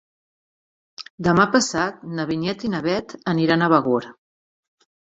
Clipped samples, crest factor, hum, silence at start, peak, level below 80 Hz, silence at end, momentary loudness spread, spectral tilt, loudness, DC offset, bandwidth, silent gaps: under 0.1%; 22 dB; none; 1 s; -2 dBFS; -56 dBFS; 0.95 s; 11 LU; -5 dB/octave; -21 LUFS; under 0.1%; 8.4 kHz; 1.10-1.18 s